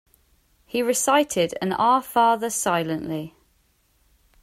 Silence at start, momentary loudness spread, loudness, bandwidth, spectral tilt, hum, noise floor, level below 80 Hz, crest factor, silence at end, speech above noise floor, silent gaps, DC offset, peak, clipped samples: 0.75 s; 11 LU; -22 LUFS; 16 kHz; -3.5 dB/octave; none; -64 dBFS; -60 dBFS; 18 dB; 1.15 s; 42 dB; none; under 0.1%; -6 dBFS; under 0.1%